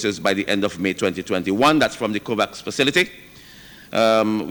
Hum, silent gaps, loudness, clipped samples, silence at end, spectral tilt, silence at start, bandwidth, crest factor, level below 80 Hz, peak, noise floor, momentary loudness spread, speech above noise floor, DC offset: none; none; -20 LUFS; under 0.1%; 0 s; -4 dB/octave; 0 s; over 20 kHz; 16 dB; -54 dBFS; -4 dBFS; -44 dBFS; 7 LU; 24 dB; under 0.1%